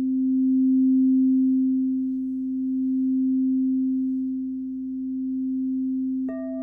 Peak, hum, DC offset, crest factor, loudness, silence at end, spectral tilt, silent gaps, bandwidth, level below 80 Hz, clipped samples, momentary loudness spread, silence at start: -16 dBFS; 60 Hz at -60 dBFS; under 0.1%; 8 dB; -24 LUFS; 0 s; -11.5 dB/octave; none; 2 kHz; -62 dBFS; under 0.1%; 10 LU; 0 s